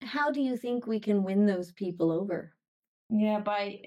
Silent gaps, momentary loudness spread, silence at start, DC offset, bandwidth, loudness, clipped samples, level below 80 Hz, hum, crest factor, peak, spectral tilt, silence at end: 2.68-2.82 s, 2.88-3.09 s; 7 LU; 0 s; under 0.1%; 10 kHz; -30 LUFS; under 0.1%; -76 dBFS; none; 14 dB; -16 dBFS; -7.5 dB/octave; 0.1 s